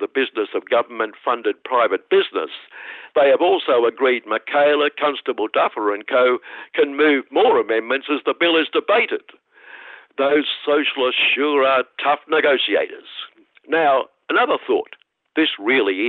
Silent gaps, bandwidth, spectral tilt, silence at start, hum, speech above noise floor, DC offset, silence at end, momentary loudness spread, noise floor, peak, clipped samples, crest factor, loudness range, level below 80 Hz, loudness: none; 4.5 kHz; -6.5 dB/octave; 0 s; none; 23 dB; under 0.1%; 0 s; 11 LU; -42 dBFS; -6 dBFS; under 0.1%; 14 dB; 2 LU; -74 dBFS; -18 LUFS